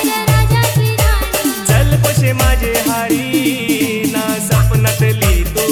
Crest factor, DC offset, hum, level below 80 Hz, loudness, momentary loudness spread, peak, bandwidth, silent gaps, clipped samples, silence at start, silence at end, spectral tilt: 12 dB; 0.1%; none; -20 dBFS; -13 LUFS; 4 LU; 0 dBFS; 19 kHz; none; under 0.1%; 0 s; 0 s; -5 dB/octave